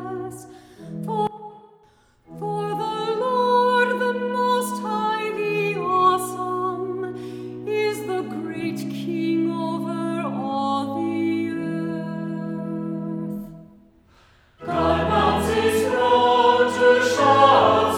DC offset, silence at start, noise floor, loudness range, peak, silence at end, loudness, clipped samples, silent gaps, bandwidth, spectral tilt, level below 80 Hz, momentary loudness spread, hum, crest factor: under 0.1%; 0 s; -57 dBFS; 9 LU; -2 dBFS; 0 s; -22 LUFS; under 0.1%; none; 18 kHz; -5 dB/octave; -50 dBFS; 15 LU; none; 20 dB